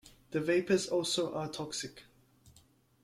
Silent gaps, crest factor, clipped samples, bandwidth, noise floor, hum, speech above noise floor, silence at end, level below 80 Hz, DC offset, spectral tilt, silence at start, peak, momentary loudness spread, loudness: none; 20 dB; under 0.1%; 14.5 kHz; -65 dBFS; none; 33 dB; 0.55 s; -70 dBFS; under 0.1%; -4 dB/octave; 0.05 s; -16 dBFS; 10 LU; -33 LUFS